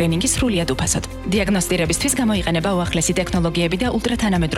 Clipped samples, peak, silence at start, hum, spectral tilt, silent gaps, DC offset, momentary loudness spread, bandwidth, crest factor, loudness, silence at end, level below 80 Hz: under 0.1%; -4 dBFS; 0 s; none; -4 dB/octave; none; under 0.1%; 3 LU; 16.5 kHz; 14 dB; -19 LUFS; 0 s; -32 dBFS